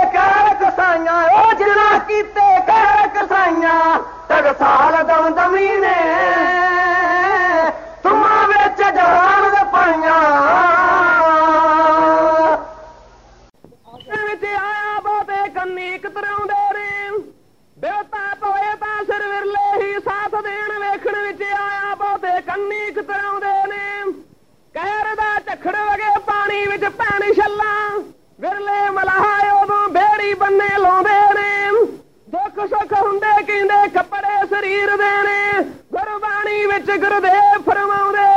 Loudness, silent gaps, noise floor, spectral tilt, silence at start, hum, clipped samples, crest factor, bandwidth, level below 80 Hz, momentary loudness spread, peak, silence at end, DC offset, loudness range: -15 LUFS; none; -53 dBFS; -4.5 dB/octave; 0 s; none; under 0.1%; 12 dB; 8.8 kHz; -50 dBFS; 11 LU; -4 dBFS; 0 s; under 0.1%; 9 LU